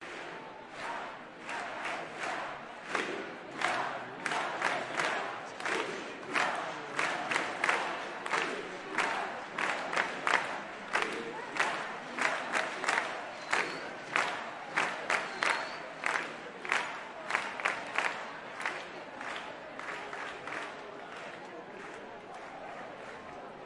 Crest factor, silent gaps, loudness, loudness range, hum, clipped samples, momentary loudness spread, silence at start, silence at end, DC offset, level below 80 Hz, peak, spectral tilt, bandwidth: 26 dB; none; -35 LUFS; 8 LU; none; under 0.1%; 13 LU; 0 s; 0 s; under 0.1%; -76 dBFS; -10 dBFS; -2 dB/octave; 11.5 kHz